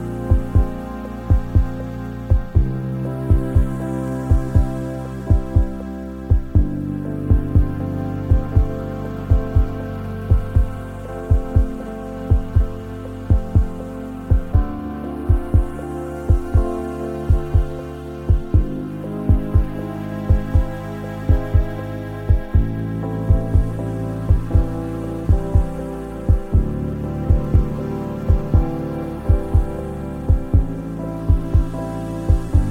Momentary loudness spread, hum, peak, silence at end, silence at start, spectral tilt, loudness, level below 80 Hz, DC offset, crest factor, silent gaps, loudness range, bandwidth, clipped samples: 10 LU; none; -2 dBFS; 0 s; 0 s; -9.5 dB/octave; -21 LUFS; -22 dBFS; under 0.1%; 18 dB; none; 1 LU; 10 kHz; under 0.1%